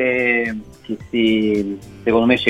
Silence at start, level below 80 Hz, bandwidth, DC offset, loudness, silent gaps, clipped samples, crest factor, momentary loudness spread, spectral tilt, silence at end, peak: 0 s; -48 dBFS; 11.5 kHz; 0.1%; -18 LUFS; none; under 0.1%; 18 dB; 14 LU; -6 dB/octave; 0 s; 0 dBFS